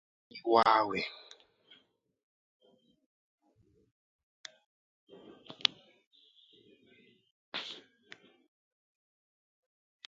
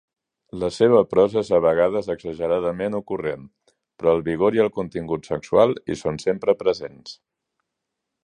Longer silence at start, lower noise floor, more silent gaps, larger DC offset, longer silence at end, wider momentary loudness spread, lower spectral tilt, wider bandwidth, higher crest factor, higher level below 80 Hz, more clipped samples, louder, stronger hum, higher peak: second, 0.35 s vs 0.55 s; second, -70 dBFS vs -81 dBFS; first, 2.23-2.60 s, 3.06-3.38 s, 3.91-4.44 s, 4.66-5.07 s, 6.06-6.11 s, 7.31-7.52 s vs none; neither; first, 2.3 s vs 1.1 s; first, 29 LU vs 12 LU; second, -0.5 dB/octave vs -6.5 dB/octave; second, 7.4 kHz vs 10 kHz; first, 36 dB vs 20 dB; second, -80 dBFS vs -54 dBFS; neither; second, -31 LUFS vs -21 LUFS; neither; about the same, -2 dBFS vs -2 dBFS